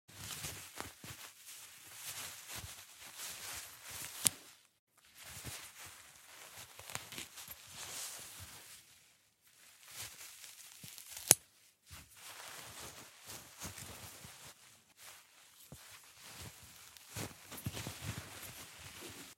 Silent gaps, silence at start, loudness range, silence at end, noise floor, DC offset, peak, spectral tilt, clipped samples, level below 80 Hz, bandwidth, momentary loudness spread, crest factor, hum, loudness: 4.79-4.87 s; 0.1 s; 14 LU; 0.05 s; -69 dBFS; under 0.1%; -2 dBFS; -1 dB/octave; under 0.1%; -70 dBFS; 16.5 kHz; 12 LU; 44 dB; none; -42 LUFS